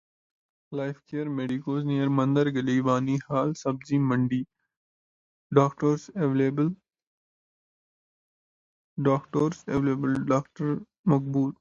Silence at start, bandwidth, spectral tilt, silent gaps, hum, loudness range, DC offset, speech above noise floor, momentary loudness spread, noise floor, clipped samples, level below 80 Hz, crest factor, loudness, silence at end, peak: 0.7 s; 7.6 kHz; -8 dB/octave; 4.77-5.50 s, 7.07-8.96 s, 10.99-11.04 s; none; 5 LU; under 0.1%; over 65 dB; 9 LU; under -90 dBFS; under 0.1%; -64 dBFS; 22 dB; -27 LUFS; 0.05 s; -6 dBFS